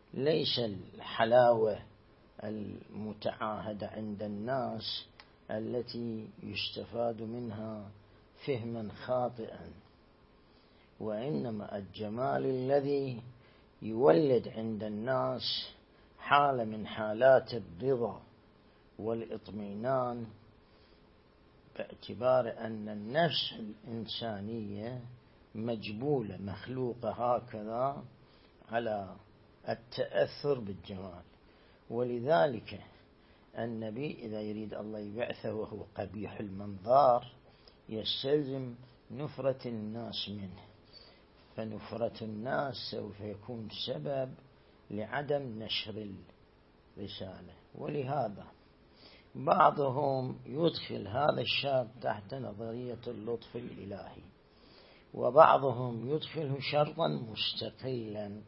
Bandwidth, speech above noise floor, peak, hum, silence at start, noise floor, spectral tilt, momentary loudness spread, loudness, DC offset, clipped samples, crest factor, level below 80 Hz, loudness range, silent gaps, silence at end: 5.8 kHz; 29 dB; -6 dBFS; none; 0.15 s; -63 dBFS; -4 dB/octave; 17 LU; -34 LUFS; under 0.1%; under 0.1%; 28 dB; -68 dBFS; 9 LU; none; 0 s